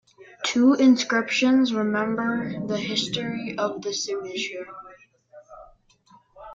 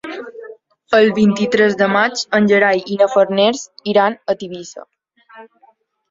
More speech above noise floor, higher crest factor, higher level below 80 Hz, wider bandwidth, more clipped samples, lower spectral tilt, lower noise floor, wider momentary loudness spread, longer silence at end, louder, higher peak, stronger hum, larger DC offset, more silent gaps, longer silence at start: second, 34 dB vs 40 dB; about the same, 18 dB vs 16 dB; about the same, -64 dBFS vs -60 dBFS; about the same, 7.6 kHz vs 7.8 kHz; neither; about the same, -4 dB/octave vs -5 dB/octave; about the same, -57 dBFS vs -54 dBFS; second, 12 LU vs 17 LU; second, 0 s vs 0.65 s; second, -23 LUFS vs -15 LUFS; second, -8 dBFS vs 0 dBFS; neither; neither; neither; first, 0.2 s vs 0.05 s